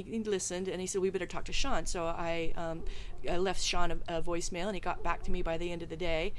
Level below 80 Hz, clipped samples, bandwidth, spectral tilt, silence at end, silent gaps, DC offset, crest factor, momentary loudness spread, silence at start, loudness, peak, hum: -40 dBFS; under 0.1%; 12 kHz; -3.5 dB/octave; 0 s; none; under 0.1%; 16 dB; 6 LU; 0 s; -35 LUFS; -14 dBFS; none